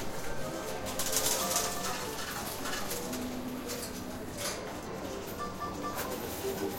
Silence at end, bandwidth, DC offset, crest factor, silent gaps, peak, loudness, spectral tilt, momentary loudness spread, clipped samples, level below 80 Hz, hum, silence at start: 0 s; 16.5 kHz; under 0.1%; 22 dB; none; -14 dBFS; -35 LUFS; -2.5 dB/octave; 10 LU; under 0.1%; -52 dBFS; none; 0 s